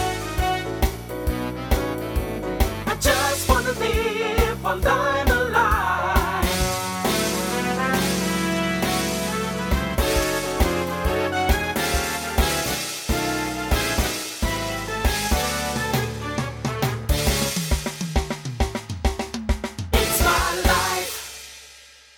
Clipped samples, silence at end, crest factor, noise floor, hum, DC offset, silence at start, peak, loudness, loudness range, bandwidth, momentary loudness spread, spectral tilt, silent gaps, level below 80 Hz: under 0.1%; 0.3 s; 20 dB; -47 dBFS; none; under 0.1%; 0 s; -4 dBFS; -23 LUFS; 3 LU; 18 kHz; 7 LU; -4 dB/octave; none; -28 dBFS